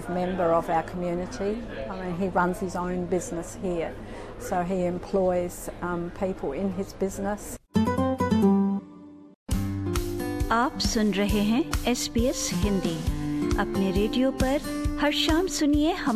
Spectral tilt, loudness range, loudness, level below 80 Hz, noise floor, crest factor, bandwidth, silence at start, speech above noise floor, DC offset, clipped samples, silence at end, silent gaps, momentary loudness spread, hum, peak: -5 dB/octave; 4 LU; -27 LUFS; -38 dBFS; -46 dBFS; 18 dB; 14.5 kHz; 0 s; 20 dB; under 0.1%; under 0.1%; 0 s; 9.36-9.46 s; 9 LU; none; -8 dBFS